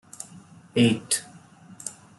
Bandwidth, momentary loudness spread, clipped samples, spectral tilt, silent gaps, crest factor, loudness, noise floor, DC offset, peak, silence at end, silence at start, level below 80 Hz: 12.5 kHz; 19 LU; under 0.1%; -4 dB/octave; none; 20 dB; -24 LUFS; -49 dBFS; under 0.1%; -8 dBFS; 0.3 s; 0.2 s; -66 dBFS